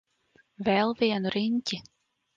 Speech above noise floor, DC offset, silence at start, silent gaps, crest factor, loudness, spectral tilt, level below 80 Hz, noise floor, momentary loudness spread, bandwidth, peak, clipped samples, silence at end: 39 dB; under 0.1%; 0.6 s; none; 18 dB; -28 LUFS; -5.5 dB/octave; -66 dBFS; -66 dBFS; 8 LU; 7.6 kHz; -12 dBFS; under 0.1%; 0.55 s